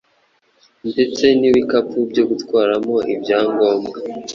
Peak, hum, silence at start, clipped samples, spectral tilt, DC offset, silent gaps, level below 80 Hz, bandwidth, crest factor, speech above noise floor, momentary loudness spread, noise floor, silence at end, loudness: -2 dBFS; none; 0.85 s; under 0.1%; -5 dB/octave; under 0.1%; none; -56 dBFS; 7.4 kHz; 16 dB; 44 dB; 9 LU; -60 dBFS; 0 s; -17 LUFS